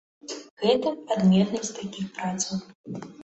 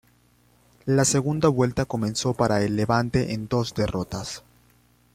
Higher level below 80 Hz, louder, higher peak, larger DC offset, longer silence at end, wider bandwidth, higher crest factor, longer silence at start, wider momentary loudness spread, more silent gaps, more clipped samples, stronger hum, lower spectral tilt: second, -64 dBFS vs -48 dBFS; about the same, -26 LUFS vs -24 LUFS; about the same, -8 dBFS vs -6 dBFS; neither; second, 0 s vs 0.75 s; second, 8.2 kHz vs 15.5 kHz; about the same, 18 dB vs 20 dB; second, 0.25 s vs 0.85 s; first, 18 LU vs 11 LU; first, 0.51-0.57 s, 2.75-2.84 s vs none; neither; second, none vs 60 Hz at -45 dBFS; about the same, -5.5 dB/octave vs -5 dB/octave